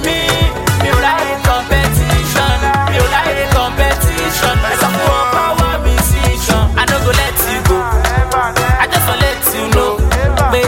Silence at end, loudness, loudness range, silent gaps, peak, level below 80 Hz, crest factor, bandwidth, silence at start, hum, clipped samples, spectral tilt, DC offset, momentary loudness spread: 0 s; -13 LUFS; 0 LU; none; 0 dBFS; -18 dBFS; 12 dB; 17 kHz; 0 s; none; under 0.1%; -4 dB/octave; under 0.1%; 2 LU